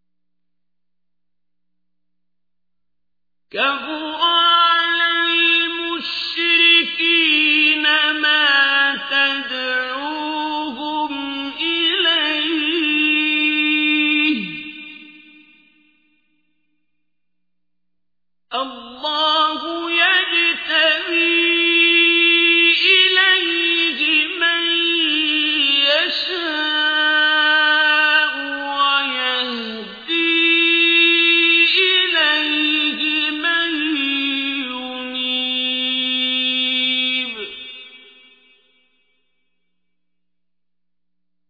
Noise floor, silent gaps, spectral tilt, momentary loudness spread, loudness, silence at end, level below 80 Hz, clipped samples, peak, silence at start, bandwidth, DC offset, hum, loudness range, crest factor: -84 dBFS; none; -2.5 dB/octave; 12 LU; -15 LUFS; 3.5 s; -66 dBFS; under 0.1%; -2 dBFS; 3.55 s; 5 kHz; under 0.1%; 60 Hz at -80 dBFS; 10 LU; 18 dB